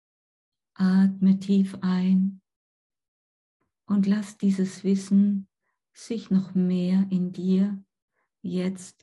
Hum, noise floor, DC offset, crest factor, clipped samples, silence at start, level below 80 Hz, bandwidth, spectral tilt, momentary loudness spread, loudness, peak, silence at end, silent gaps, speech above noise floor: none; under -90 dBFS; under 0.1%; 14 dB; under 0.1%; 0.8 s; -74 dBFS; 11 kHz; -8 dB/octave; 10 LU; -25 LUFS; -12 dBFS; 0.15 s; 2.56-2.90 s, 3.08-3.60 s, 8.02-8.08 s; over 67 dB